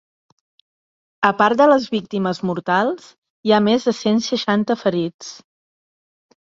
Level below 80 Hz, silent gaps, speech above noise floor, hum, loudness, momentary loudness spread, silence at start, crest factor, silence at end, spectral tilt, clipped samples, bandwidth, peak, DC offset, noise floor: -62 dBFS; 3.18-3.22 s, 3.30-3.43 s, 5.14-5.19 s; over 72 dB; none; -18 LUFS; 12 LU; 1.2 s; 18 dB; 1.1 s; -5.5 dB/octave; under 0.1%; 7.8 kHz; -2 dBFS; under 0.1%; under -90 dBFS